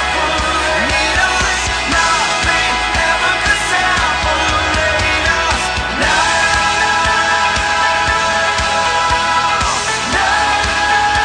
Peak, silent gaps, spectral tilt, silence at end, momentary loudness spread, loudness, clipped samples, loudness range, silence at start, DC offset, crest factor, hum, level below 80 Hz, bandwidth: 0 dBFS; none; -2 dB/octave; 0 s; 2 LU; -13 LUFS; under 0.1%; 1 LU; 0 s; under 0.1%; 14 dB; none; -28 dBFS; 10.5 kHz